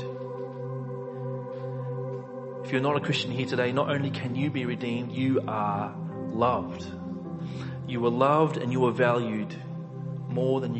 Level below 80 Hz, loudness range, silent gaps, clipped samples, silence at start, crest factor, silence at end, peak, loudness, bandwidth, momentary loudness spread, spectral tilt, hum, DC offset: -60 dBFS; 3 LU; none; under 0.1%; 0 s; 18 dB; 0 s; -10 dBFS; -29 LUFS; 8.4 kHz; 12 LU; -7 dB/octave; none; under 0.1%